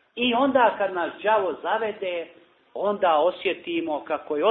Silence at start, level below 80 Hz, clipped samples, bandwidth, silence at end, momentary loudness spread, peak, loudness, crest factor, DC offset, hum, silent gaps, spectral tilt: 0.15 s; -66 dBFS; under 0.1%; 4.2 kHz; 0 s; 10 LU; -6 dBFS; -24 LUFS; 18 dB; under 0.1%; none; none; -8.5 dB/octave